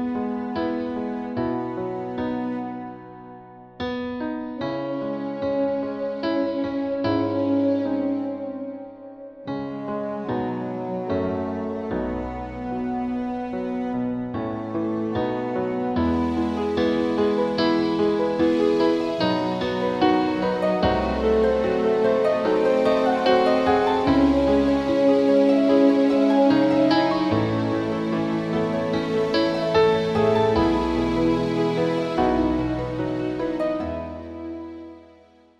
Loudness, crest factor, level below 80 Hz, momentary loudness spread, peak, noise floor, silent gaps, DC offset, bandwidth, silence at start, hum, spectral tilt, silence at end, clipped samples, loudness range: -23 LUFS; 16 dB; -44 dBFS; 12 LU; -6 dBFS; -53 dBFS; none; under 0.1%; 9.4 kHz; 0 s; none; -7 dB/octave; 0.55 s; under 0.1%; 10 LU